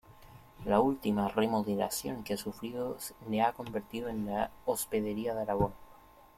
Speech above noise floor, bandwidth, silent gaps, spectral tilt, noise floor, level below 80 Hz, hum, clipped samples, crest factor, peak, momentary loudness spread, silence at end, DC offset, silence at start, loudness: 24 dB; 16.5 kHz; none; -5 dB/octave; -57 dBFS; -56 dBFS; none; under 0.1%; 20 dB; -14 dBFS; 9 LU; 0.45 s; under 0.1%; 0.1 s; -33 LUFS